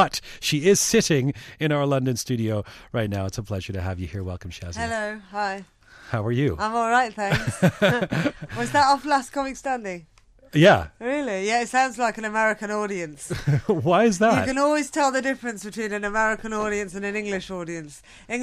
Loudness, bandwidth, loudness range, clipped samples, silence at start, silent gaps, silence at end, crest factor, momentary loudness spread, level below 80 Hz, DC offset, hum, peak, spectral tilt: -23 LUFS; 15 kHz; 6 LU; under 0.1%; 0 s; none; 0 s; 18 dB; 12 LU; -48 dBFS; under 0.1%; none; -6 dBFS; -4.5 dB/octave